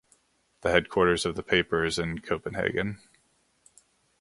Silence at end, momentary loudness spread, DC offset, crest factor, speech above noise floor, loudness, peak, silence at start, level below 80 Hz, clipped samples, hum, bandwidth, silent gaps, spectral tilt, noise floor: 1.25 s; 8 LU; under 0.1%; 26 dB; 42 dB; -27 LUFS; -4 dBFS; 0.65 s; -50 dBFS; under 0.1%; none; 11.5 kHz; none; -4.5 dB/octave; -69 dBFS